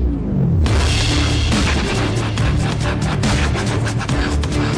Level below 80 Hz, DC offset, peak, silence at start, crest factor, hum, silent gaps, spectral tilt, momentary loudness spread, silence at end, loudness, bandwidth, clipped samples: -22 dBFS; under 0.1%; -10 dBFS; 0 s; 6 dB; none; none; -5 dB/octave; 3 LU; 0 s; -18 LUFS; 11 kHz; under 0.1%